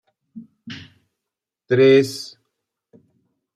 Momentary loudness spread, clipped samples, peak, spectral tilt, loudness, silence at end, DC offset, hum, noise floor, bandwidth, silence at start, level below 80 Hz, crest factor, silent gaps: 24 LU; under 0.1%; -4 dBFS; -6 dB/octave; -16 LUFS; 1.3 s; under 0.1%; none; -85 dBFS; 14 kHz; 0.35 s; -70 dBFS; 20 dB; none